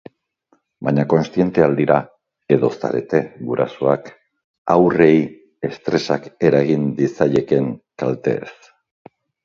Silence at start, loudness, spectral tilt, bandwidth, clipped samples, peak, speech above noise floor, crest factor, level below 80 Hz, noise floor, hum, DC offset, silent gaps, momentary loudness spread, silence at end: 0.8 s; -18 LUFS; -8 dB/octave; 7.4 kHz; under 0.1%; 0 dBFS; 46 dB; 18 dB; -56 dBFS; -63 dBFS; none; under 0.1%; 4.44-4.65 s; 11 LU; 0.95 s